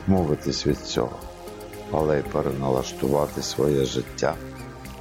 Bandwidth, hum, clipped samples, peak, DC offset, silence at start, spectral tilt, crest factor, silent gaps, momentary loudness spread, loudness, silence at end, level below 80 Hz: 16.5 kHz; none; under 0.1%; -8 dBFS; under 0.1%; 0 s; -5.5 dB/octave; 18 dB; none; 16 LU; -25 LUFS; 0 s; -42 dBFS